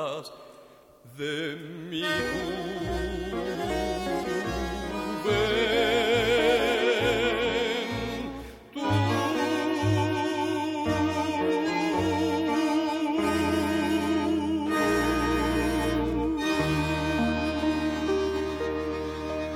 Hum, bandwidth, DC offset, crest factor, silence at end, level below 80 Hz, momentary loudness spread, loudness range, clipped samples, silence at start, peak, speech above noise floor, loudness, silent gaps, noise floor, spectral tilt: none; 16.5 kHz; under 0.1%; 14 dB; 0 s; -44 dBFS; 9 LU; 6 LU; under 0.1%; 0 s; -12 dBFS; 23 dB; -27 LUFS; none; -53 dBFS; -5.5 dB/octave